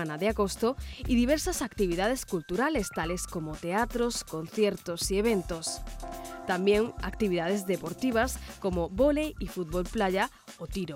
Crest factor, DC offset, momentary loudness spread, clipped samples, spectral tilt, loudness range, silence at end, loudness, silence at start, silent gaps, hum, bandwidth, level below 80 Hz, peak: 16 dB; under 0.1%; 10 LU; under 0.1%; -4.5 dB/octave; 2 LU; 0 s; -30 LUFS; 0 s; none; none; 17 kHz; -44 dBFS; -12 dBFS